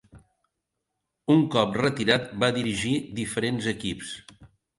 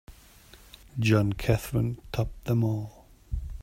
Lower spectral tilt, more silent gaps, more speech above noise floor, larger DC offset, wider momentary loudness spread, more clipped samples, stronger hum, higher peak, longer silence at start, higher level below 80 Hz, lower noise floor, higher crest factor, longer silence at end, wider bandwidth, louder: second, -5 dB/octave vs -7 dB/octave; neither; first, 57 dB vs 27 dB; neither; about the same, 13 LU vs 14 LU; neither; neither; about the same, -6 dBFS vs -8 dBFS; about the same, 0.15 s vs 0.1 s; second, -56 dBFS vs -42 dBFS; first, -82 dBFS vs -53 dBFS; about the same, 22 dB vs 20 dB; first, 0.3 s vs 0 s; second, 11.5 kHz vs 16 kHz; first, -25 LUFS vs -28 LUFS